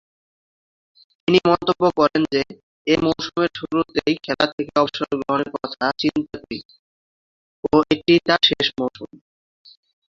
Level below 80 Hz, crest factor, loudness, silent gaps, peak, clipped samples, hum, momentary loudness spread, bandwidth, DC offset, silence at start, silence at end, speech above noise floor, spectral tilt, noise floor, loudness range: -54 dBFS; 20 dB; -20 LUFS; 2.63-2.85 s, 4.53-4.58 s, 6.65-6.69 s, 6.79-7.63 s; -2 dBFS; under 0.1%; none; 14 LU; 7.4 kHz; under 0.1%; 1.3 s; 1.05 s; over 70 dB; -5.5 dB/octave; under -90 dBFS; 3 LU